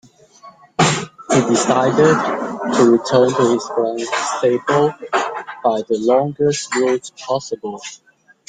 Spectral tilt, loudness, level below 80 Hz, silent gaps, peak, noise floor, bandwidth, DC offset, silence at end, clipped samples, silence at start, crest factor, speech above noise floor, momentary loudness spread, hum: -4.5 dB/octave; -17 LUFS; -58 dBFS; none; -2 dBFS; -44 dBFS; 9.6 kHz; under 0.1%; 0.55 s; under 0.1%; 0.45 s; 16 dB; 28 dB; 10 LU; none